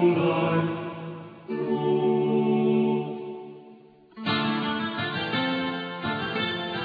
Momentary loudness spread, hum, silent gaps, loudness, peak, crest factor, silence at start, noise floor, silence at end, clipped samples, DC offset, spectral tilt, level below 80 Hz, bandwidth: 15 LU; none; none; -26 LUFS; -10 dBFS; 16 dB; 0 s; -51 dBFS; 0 s; under 0.1%; under 0.1%; -8.5 dB/octave; -66 dBFS; 5 kHz